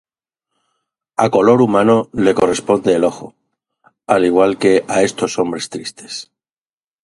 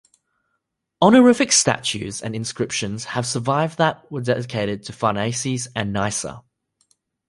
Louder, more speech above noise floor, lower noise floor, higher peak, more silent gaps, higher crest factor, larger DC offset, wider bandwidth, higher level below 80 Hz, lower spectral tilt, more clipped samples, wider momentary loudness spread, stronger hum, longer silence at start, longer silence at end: first, -15 LUFS vs -20 LUFS; first, over 76 dB vs 56 dB; first, under -90 dBFS vs -76 dBFS; about the same, 0 dBFS vs -2 dBFS; neither; about the same, 16 dB vs 20 dB; neither; about the same, 11.5 kHz vs 11.5 kHz; about the same, -52 dBFS vs -54 dBFS; about the same, -5 dB/octave vs -4 dB/octave; neither; about the same, 15 LU vs 14 LU; neither; first, 1.2 s vs 1 s; about the same, 0.8 s vs 0.9 s